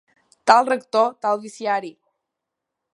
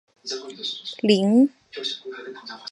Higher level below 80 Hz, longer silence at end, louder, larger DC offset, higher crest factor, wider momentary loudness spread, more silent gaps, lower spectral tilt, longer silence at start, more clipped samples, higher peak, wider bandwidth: about the same, -72 dBFS vs -74 dBFS; first, 1.05 s vs 0 s; first, -20 LUFS vs -23 LUFS; neither; about the same, 22 dB vs 20 dB; second, 9 LU vs 19 LU; neither; second, -3 dB/octave vs -5.5 dB/octave; first, 0.45 s vs 0.25 s; neither; first, 0 dBFS vs -4 dBFS; about the same, 11.5 kHz vs 11.5 kHz